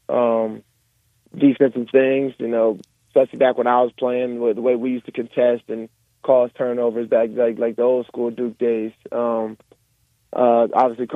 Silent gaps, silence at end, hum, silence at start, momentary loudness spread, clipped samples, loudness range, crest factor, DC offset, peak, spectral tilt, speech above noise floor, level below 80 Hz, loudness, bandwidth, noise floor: none; 0 s; none; 0.1 s; 11 LU; under 0.1%; 3 LU; 18 dB; under 0.1%; -2 dBFS; -8 dB/octave; 45 dB; -70 dBFS; -20 LUFS; 4.6 kHz; -64 dBFS